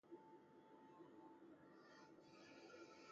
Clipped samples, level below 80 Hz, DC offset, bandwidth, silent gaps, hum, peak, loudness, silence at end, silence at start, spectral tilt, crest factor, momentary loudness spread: under 0.1%; under -90 dBFS; under 0.1%; 7.6 kHz; none; none; -48 dBFS; -65 LUFS; 0 s; 0.05 s; -3.5 dB/octave; 16 dB; 5 LU